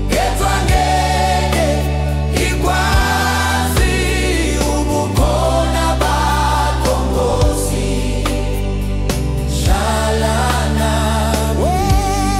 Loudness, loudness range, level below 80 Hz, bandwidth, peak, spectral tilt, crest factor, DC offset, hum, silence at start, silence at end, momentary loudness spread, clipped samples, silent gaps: -16 LUFS; 2 LU; -18 dBFS; 16 kHz; -2 dBFS; -5 dB/octave; 12 dB; under 0.1%; none; 0 s; 0 s; 4 LU; under 0.1%; none